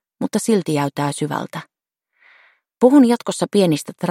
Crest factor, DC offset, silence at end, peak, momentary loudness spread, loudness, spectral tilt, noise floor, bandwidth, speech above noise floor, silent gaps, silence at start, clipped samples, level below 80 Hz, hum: 18 dB; under 0.1%; 0 s; 0 dBFS; 12 LU; -18 LUFS; -5.5 dB/octave; -73 dBFS; 16 kHz; 56 dB; none; 0.2 s; under 0.1%; -66 dBFS; none